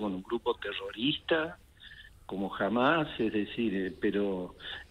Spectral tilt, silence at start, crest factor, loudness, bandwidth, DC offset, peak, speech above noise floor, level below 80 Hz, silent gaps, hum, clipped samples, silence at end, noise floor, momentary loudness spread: -6.5 dB/octave; 0 s; 20 dB; -32 LUFS; 12.5 kHz; under 0.1%; -12 dBFS; 21 dB; -58 dBFS; none; none; under 0.1%; 0.05 s; -52 dBFS; 18 LU